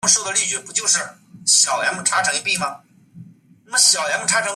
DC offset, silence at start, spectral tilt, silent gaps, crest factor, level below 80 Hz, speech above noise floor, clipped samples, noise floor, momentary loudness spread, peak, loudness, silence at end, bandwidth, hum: under 0.1%; 0.05 s; 0.5 dB/octave; none; 18 dB; -68 dBFS; 27 dB; under 0.1%; -46 dBFS; 8 LU; -2 dBFS; -17 LUFS; 0 s; 14.5 kHz; none